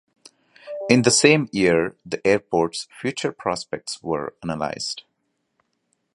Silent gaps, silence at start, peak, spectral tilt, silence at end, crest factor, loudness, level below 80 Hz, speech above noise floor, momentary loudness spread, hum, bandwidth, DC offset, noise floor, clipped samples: none; 0.65 s; 0 dBFS; -4 dB/octave; 1.15 s; 22 dB; -21 LUFS; -58 dBFS; 52 dB; 14 LU; none; 11.5 kHz; under 0.1%; -74 dBFS; under 0.1%